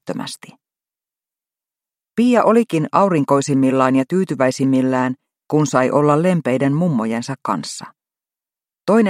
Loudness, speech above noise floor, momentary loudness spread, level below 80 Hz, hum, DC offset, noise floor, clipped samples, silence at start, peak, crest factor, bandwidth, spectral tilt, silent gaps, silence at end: -17 LUFS; over 74 dB; 13 LU; -64 dBFS; none; under 0.1%; under -90 dBFS; under 0.1%; 0.05 s; 0 dBFS; 18 dB; 13.5 kHz; -6.5 dB/octave; none; 0 s